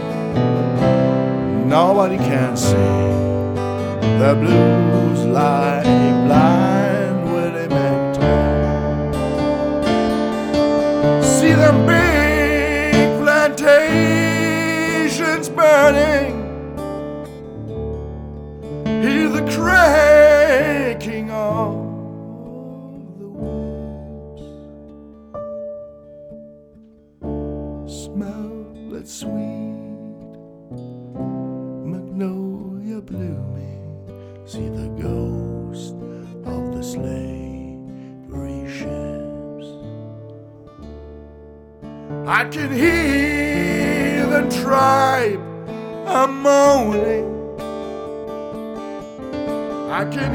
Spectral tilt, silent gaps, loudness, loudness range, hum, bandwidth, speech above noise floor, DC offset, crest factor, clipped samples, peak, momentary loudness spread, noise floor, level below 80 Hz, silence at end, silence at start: -6 dB/octave; none; -17 LUFS; 17 LU; none; over 20 kHz; 33 dB; under 0.1%; 18 dB; under 0.1%; 0 dBFS; 21 LU; -48 dBFS; -36 dBFS; 0 s; 0 s